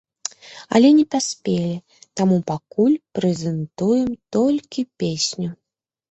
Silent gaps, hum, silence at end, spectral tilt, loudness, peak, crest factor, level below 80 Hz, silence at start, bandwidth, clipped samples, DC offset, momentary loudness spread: none; none; 0.6 s; -5.5 dB/octave; -20 LUFS; -2 dBFS; 18 dB; -58 dBFS; 0.45 s; 8.4 kHz; under 0.1%; under 0.1%; 16 LU